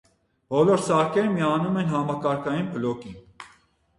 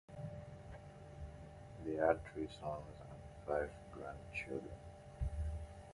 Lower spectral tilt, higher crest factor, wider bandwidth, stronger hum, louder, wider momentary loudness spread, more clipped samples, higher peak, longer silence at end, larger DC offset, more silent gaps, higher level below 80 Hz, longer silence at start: about the same, -6.5 dB/octave vs -7.5 dB/octave; second, 16 dB vs 26 dB; about the same, 11.5 kHz vs 11.5 kHz; neither; first, -24 LUFS vs -44 LUFS; second, 10 LU vs 18 LU; neither; first, -8 dBFS vs -18 dBFS; first, 0.55 s vs 0 s; neither; neither; second, -60 dBFS vs -52 dBFS; first, 0.5 s vs 0.1 s